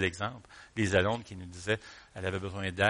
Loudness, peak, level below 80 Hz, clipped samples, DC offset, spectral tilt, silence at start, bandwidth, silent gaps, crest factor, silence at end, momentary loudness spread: -33 LUFS; -10 dBFS; -58 dBFS; under 0.1%; under 0.1%; -5 dB/octave; 0 s; 10.5 kHz; none; 24 dB; 0 s; 16 LU